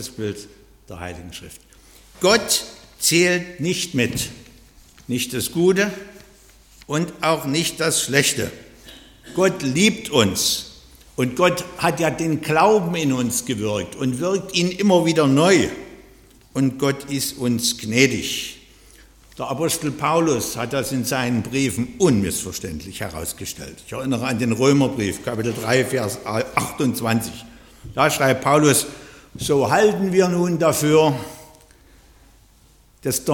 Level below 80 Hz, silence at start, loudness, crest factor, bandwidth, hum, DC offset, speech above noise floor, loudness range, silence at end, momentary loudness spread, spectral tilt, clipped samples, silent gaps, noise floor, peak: -50 dBFS; 0 s; -20 LUFS; 20 dB; 17.5 kHz; none; under 0.1%; 33 dB; 4 LU; 0 s; 14 LU; -4 dB/octave; under 0.1%; none; -53 dBFS; -2 dBFS